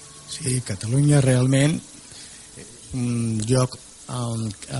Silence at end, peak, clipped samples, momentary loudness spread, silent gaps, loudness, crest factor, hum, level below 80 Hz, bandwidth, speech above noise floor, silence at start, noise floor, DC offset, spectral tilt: 0 s; -6 dBFS; under 0.1%; 22 LU; none; -22 LUFS; 16 dB; none; -50 dBFS; 11.5 kHz; 21 dB; 0 s; -42 dBFS; under 0.1%; -5.5 dB/octave